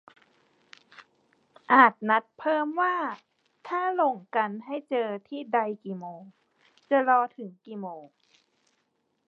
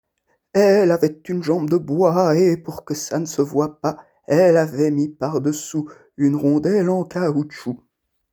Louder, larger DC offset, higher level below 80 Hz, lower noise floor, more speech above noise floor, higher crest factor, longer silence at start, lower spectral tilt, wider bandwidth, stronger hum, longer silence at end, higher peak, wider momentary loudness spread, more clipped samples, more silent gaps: second, -26 LUFS vs -19 LUFS; neither; second, -88 dBFS vs -62 dBFS; first, -75 dBFS vs -69 dBFS; about the same, 49 dB vs 50 dB; first, 26 dB vs 16 dB; first, 1.7 s vs 0.55 s; about the same, -7 dB/octave vs -6.5 dB/octave; second, 6.8 kHz vs over 20 kHz; neither; first, 1.2 s vs 0.55 s; about the same, -2 dBFS vs -2 dBFS; first, 20 LU vs 12 LU; neither; neither